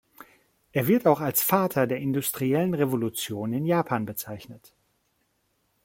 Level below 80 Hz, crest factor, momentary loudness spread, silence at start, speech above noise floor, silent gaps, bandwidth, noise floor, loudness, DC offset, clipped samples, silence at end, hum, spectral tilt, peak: -64 dBFS; 20 dB; 10 LU; 0.75 s; 47 dB; none; 17 kHz; -72 dBFS; -25 LUFS; under 0.1%; under 0.1%; 1.3 s; none; -5.5 dB/octave; -6 dBFS